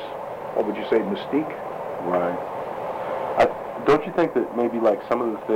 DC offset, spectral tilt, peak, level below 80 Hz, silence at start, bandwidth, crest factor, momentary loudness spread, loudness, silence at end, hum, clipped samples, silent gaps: under 0.1%; -7 dB/octave; -8 dBFS; -56 dBFS; 0 s; 16.5 kHz; 16 dB; 10 LU; -24 LUFS; 0 s; none; under 0.1%; none